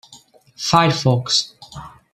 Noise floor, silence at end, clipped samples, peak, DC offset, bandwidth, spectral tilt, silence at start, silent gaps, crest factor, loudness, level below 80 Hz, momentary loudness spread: -48 dBFS; 0.25 s; under 0.1%; -2 dBFS; under 0.1%; 14 kHz; -4 dB/octave; 0.1 s; none; 18 dB; -17 LUFS; -52 dBFS; 22 LU